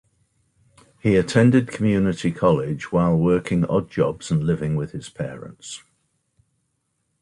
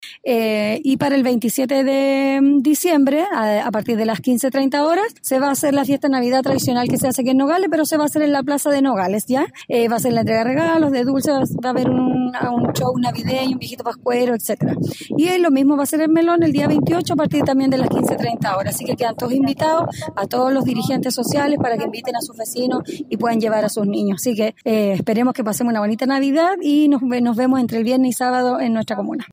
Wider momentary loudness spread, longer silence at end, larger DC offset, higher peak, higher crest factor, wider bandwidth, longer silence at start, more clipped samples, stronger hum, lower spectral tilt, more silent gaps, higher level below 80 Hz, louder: first, 15 LU vs 6 LU; first, 1.45 s vs 0.05 s; neither; about the same, -4 dBFS vs -6 dBFS; first, 18 dB vs 12 dB; second, 11 kHz vs 16 kHz; first, 1.05 s vs 0 s; neither; neither; first, -7 dB/octave vs -5 dB/octave; neither; first, -48 dBFS vs -58 dBFS; second, -21 LUFS vs -18 LUFS